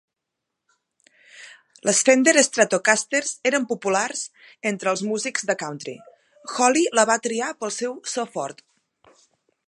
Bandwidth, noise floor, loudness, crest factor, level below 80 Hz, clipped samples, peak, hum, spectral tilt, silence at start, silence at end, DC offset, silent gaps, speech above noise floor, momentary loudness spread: 11.5 kHz; -82 dBFS; -21 LUFS; 22 dB; -76 dBFS; under 0.1%; 0 dBFS; none; -2 dB/octave; 1.35 s; 1.15 s; under 0.1%; none; 60 dB; 15 LU